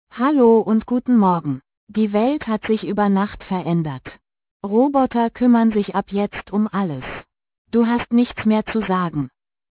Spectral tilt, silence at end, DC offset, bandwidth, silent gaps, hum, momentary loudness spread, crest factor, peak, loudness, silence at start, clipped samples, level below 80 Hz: -11.5 dB/octave; 0.4 s; under 0.1%; 4 kHz; 1.77-1.87 s, 4.51-4.60 s, 7.58-7.65 s; none; 13 LU; 14 dB; -4 dBFS; -19 LUFS; 0.15 s; under 0.1%; -50 dBFS